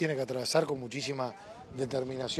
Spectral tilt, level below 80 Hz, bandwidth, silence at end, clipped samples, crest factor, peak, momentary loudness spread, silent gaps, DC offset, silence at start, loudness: -4.5 dB/octave; -66 dBFS; 14.5 kHz; 0 s; under 0.1%; 20 dB; -14 dBFS; 10 LU; none; under 0.1%; 0 s; -33 LUFS